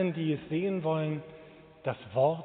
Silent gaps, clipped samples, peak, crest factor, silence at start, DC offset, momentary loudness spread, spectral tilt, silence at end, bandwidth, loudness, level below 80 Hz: none; under 0.1%; -14 dBFS; 18 dB; 0 s; under 0.1%; 12 LU; -6.5 dB/octave; 0 s; 4.4 kHz; -32 LUFS; -70 dBFS